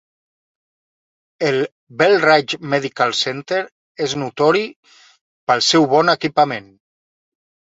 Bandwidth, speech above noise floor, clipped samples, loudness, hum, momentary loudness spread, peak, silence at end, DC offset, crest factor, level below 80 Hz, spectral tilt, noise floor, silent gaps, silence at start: 8 kHz; over 73 dB; under 0.1%; -17 LUFS; none; 12 LU; -2 dBFS; 1.15 s; under 0.1%; 18 dB; -64 dBFS; -4 dB/octave; under -90 dBFS; 1.72-1.87 s, 3.72-3.95 s, 4.76-4.83 s, 5.21-5.47 s; 1.4 s